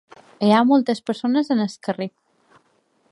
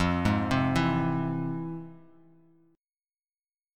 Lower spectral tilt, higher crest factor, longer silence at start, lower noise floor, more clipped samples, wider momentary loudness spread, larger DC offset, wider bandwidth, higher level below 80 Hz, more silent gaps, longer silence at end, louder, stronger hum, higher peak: about the same, -6.5 dB/octave vs -7 dB/octave; about the same, 18 dB vs 20 dB; first, 0.4 s vs 0 s; second, -64 dBFS vs under -90 dBFS; neither; about the same, 12 LU vs 13 LU; neither; second, 11 kHz vs 12.5 kHz; second, -72 dBFS vs -48 dBFS; neither; second, 1.05 s vs 1.75 s; first, -20 LUFS vs -28 LUFS; neither; first, -4 dBFS vs -10 dBFS